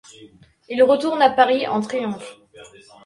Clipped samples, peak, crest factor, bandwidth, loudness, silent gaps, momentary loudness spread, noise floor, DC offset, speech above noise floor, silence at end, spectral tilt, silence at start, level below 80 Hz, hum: under 0.1%; -2 dBFS; 20 dB; 11 kHz; -19 LUFS; none; 15 LU; -48 dBFS; under 0.1%; 30 dB; 0.4 s; -5 dB/octave; 0.2 s; -64 dBFS; none